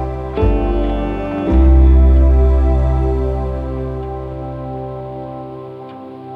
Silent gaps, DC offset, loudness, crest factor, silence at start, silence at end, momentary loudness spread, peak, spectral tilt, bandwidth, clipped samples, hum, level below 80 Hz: none; under 0.1%; -16 LUFS; 12 dB; 0 s; 0 s; 19 LU; -2 dBFS; -10.5 dB/octave; 3.7 kHz; under 0.1%; none; -16 dBFS